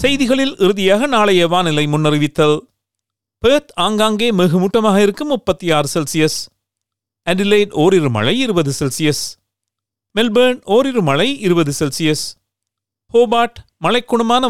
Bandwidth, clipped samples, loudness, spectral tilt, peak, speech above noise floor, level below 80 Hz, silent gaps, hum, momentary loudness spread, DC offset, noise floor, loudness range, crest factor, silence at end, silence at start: 16 kHz; under 0.1%; -15 LUFS; -5 dB/octave; -2 dBFS; 67 dB; -46 dBFS; none; none; 7 LU; 2%; -81 dBFS; 2 LU; 14 dB; 0 s; 0 s